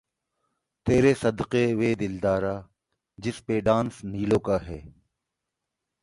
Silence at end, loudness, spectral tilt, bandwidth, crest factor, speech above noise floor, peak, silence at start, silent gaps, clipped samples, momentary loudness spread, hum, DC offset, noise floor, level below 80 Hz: 1.1 s; -25 LUFS; -7 dB/octave; 11.5 kHz; 20 dB; 60 dB; -8 dBFS; 0.85 s; none; under 0.1%; 13 LU; none; under 0.1%; -84 dBFS; -50 dBFS